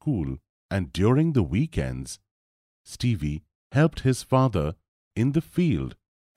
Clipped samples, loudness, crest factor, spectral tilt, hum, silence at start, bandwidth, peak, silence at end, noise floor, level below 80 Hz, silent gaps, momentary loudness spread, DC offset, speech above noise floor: under 0.1%; -25 LUFS; 18 dB; -7 dB/octave; none; 0.05 s; 14 kHz; -8 dBFS; 0.45 s; under -90 dBFS; -42 dBFS; 0.49-0.69 s, 2.31-2.85 s, 3.55-3.70 s, 4.88-5.11 s; 15 LU; under 0.1%; over 66 dB